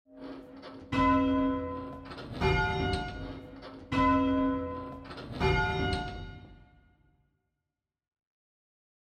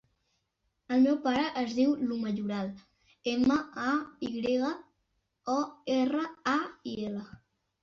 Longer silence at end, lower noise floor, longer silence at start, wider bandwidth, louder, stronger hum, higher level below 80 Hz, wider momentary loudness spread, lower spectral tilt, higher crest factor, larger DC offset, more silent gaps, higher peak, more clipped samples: first, 2.5 s vs 0.45 s; first, -88 dBFS vs -79 dBFS; second, 0.1 s vs 0.9 s; first, 9 kHz vs 7.2 kHz; about the same, -30 LUFS vs -31 LUFS; neither; first, -44 dBFS vs -66 dBFS; first, 20 LU vs 11 LU; first, -7 dB/octave vs -5.5 dB/octave; about the same, 18 dB vs 16 dB; neither; neither; about the same, -14 dBFS vs -16 dBFS; neither